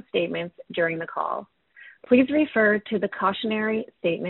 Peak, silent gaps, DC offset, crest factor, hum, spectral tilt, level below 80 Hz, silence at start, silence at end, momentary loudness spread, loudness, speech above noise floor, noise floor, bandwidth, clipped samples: -6 dBFS; none; under 0.1%; 18 dB; none; -3.5 dB/octave; -64 dBFS; 0.15 s; 0 s; 10 LU; -24 LUFS; 27 dB; -51 dBFS; 4.2 kHz; under 0.1%